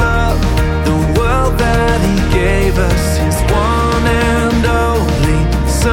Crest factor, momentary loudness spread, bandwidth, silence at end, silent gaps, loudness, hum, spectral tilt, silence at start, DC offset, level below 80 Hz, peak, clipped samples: 12 dB; 2 LU; 17 kHz; 0 s; none; -13 LUFS; none; -6 dB/octave; 0 s; under 0.1%; -16 dBFS; 0 dBFS; under 0.1%